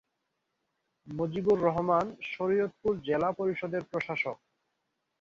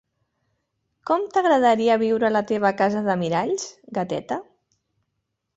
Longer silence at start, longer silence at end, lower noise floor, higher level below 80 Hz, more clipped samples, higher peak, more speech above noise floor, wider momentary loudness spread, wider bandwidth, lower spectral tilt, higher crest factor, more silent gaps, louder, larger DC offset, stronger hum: about the same, 1.05 s vs 1.05 s; second, 0.85 s vs 1.15 s; first, -82 dBFS vs -78 dBFS; about the same, -64 dBFS vs -64 dBFS; neither; second, -12 dBFS vs -6 dBFS; second, 52 dB vs 57 dB; second, 9 LU vs 12 LU; second, 7.4 kHz vs 8.2 kHz; first, -7.5 dB/octave vs -5.5 dB/octave; about the same, 20 dB vs 18 dB; neither; second, -30 LUFS vs -22 LUFS; neither; neither